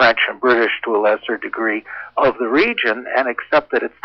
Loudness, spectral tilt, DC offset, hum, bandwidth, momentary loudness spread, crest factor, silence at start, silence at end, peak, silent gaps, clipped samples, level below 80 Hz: -17 LUFS; -5.5 dB/octave; under 0.1%; none; 6.4 kHz; 6 LU; 14 dB; 0 s; 0.15 s; -4 dBFS; none; under 0.1%; -56 dBFS